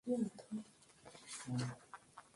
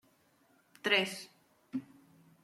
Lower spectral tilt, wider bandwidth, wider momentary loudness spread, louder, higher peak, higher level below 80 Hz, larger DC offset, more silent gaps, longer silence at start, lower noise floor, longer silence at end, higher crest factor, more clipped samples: first, -5.5 dB/octave vs -3 dB/octave; second, 11.5 kHz vs 16 kHz; about the same, 19 LU vs 17 LU; second, -45 LUFS vs -33 LUFS; second, -26 dBFS vs -14 dBFS; first, -76 dBFS vs -86 dBFS; neither; neither; second, 0.05 s vs 0.85 s; second, -63 dBFS vs -69 dBFS; second, 0.15 s vs 0.6 s; second, 18 dB vs 26 dB; neither